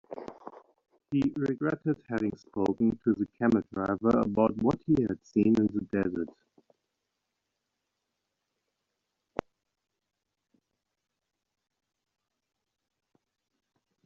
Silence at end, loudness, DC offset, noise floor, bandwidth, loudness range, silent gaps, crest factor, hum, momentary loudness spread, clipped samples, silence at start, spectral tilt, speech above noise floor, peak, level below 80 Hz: 7.8 s; -29 LUFS; under 0.1%; -85 dBFS; 7.2 kHz; 22 LU; none; 20 dB; none; 15 LU; under 0.1%; 0.1 s; -8 dB/octave; 57 dB; -12 dBFS; -62 dBFS